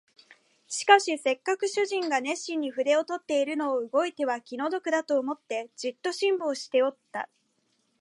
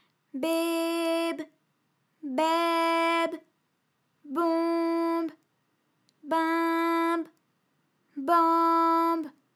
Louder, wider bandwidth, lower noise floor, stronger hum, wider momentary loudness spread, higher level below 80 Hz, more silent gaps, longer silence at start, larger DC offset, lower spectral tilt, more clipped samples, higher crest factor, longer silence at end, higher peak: about the same, -27 LUFS vs -27 LUFS; second, 11.5 kHz vs 15.5 kHz; about the same, -72 dBFS vs -75 dBFS; neither; second, 11 LU vs 15 LU; about the same, -86 dBFS vs under -90 dBFS; neither; about the same, 0.3 s vs 0.35 s; neither; about the same, -1.5 dB/octave vs -2.5 dB/octave; neither; first, 24 dB vs 18 dB; first, 0.75 s vs 0.25 s; first, -4 dBFS vs -10 dBFS